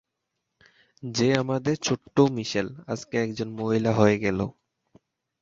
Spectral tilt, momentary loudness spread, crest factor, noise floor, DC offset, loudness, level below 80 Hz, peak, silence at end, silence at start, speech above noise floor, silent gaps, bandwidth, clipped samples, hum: -5.5 dB/octave; 11 LU; 24 dB; -81 dBFS; under 0.1%; -25 LUFS; -56 dBFS; -4 dBFS; 0.9 s; 1.05 s; 57 dB; none; 7.8 kHz; under 0.1%; none